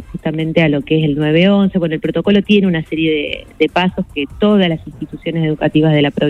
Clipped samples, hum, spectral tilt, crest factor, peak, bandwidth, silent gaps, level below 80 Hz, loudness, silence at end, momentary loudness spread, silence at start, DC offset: under 0.1%; none; -8 dB/octave; 14 dB; 0 dBFS; 6.2 kHz; none; -40 dBFS; -15 LUFS; 0 s; 10 LU; 0 s; under 0.1%